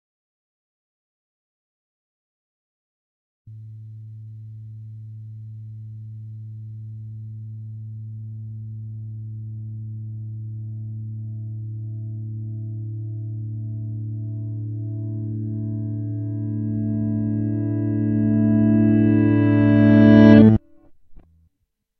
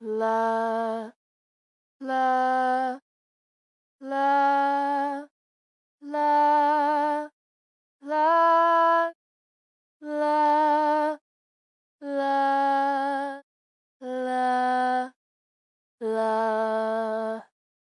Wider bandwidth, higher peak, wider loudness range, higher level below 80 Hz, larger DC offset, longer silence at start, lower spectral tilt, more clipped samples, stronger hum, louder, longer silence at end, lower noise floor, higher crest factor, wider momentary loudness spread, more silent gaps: second, 5.6 kHz vs 11 kHz; first, 0 dBFS vs -12 dBFS; first, 23 LU vs 5 LU; first, -50 dBFS vs under -90 dBFS; neither; first, 3.45 s vs 0 s; first, -11 dB/octave vs -4.5 dB/octave; neither; neither; first, -20 LUFS vs -24 LUFS; first, 0.8 s vs 0.55 s; second, -74 dBFS vs under -90 dBFS; first, 22 dB vs 14 dB; first, 23 LU vs 16 LU; second, none vs 1.16-2.00 s, 3.02-3.99 s, 5.31-5.98 s, 7.33-8.00 s, 9.15-10.00 s, 11.21-11.99 s, 13.43-14.00 s, 15.16-15.98 s